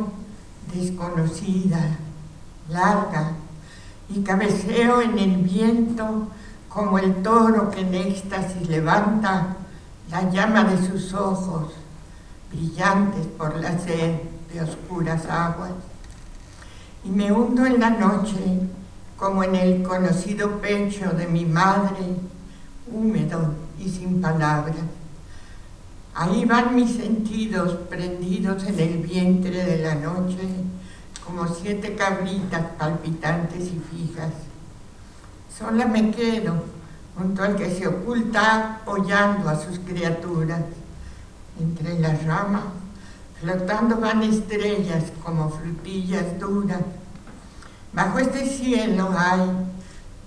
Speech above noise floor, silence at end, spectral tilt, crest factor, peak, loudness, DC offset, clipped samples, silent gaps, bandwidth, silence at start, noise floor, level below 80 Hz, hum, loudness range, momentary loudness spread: 21 dB; 0 s; -6.5 dB/octave; 22 dB; -2 dBFS; -23 LUFS; under 0.1%; under 0.1%; none; 11 kHz; 0 s; -42 dBFS; -44 dBFS; none; 5 LU; 20 LU